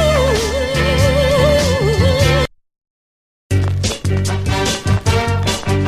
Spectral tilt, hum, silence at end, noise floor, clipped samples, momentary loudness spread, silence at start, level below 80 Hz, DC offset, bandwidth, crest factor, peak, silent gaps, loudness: -5 dB/octave; none; 0 s; under -90 dBFS; under 0.1%; 5 LU; 0 s; -26 dBFS; under 0.1%; 15 kHz; 14 dB; -2 dBFS; 2.90-3.50 s; -15 LUFS